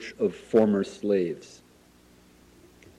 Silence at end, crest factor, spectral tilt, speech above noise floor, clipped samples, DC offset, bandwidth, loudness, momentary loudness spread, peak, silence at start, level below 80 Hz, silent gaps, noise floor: 1.55 s; 18 dB; -7 dB/octave; 32 dB; under 0.1%; under 0.1%; 12 kHz; -26 LUFS; 10 LU; -10 dBFS; 0 s; -64 dBFS; none; -57 dBFS